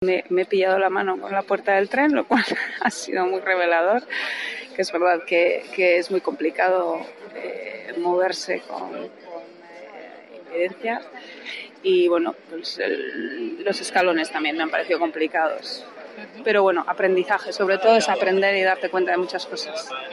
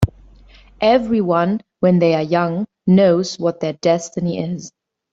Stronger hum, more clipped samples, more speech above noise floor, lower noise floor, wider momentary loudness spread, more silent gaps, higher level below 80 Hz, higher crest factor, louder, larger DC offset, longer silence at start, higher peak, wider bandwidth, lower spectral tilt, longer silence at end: neither; neither; second, 20 dB vs 29 dB; about the same, -42 dBFS vs -45 dBFS; first, 15 LU vs 9 LU; neither; second, -74 dBFS vs -42 dBFS; about the same, 18 dB vs 16 dB; second, -22 LUFS vs -17 LUFS; neither; about the same, 0 s vs 0 s; about the same, -4 dBFS vs -2 dBFS; first, 11.5 kHz vs 8 kHz; second, -3.5 dB/octave vs -7 dB/octave; second, 0 s vs 0.45 s